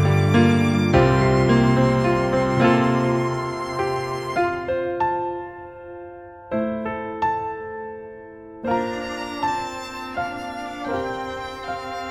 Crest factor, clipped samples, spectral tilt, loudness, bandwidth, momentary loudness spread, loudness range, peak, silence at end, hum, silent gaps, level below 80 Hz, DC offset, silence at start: 20 dB; under 0.1%; -7 dB/octave; -22 LUFS; 12.5 kHz; 18 LU; 10 LU; -2 dBFS; 0 s; none; none; -42 dBFS; under 0.1%; 0 s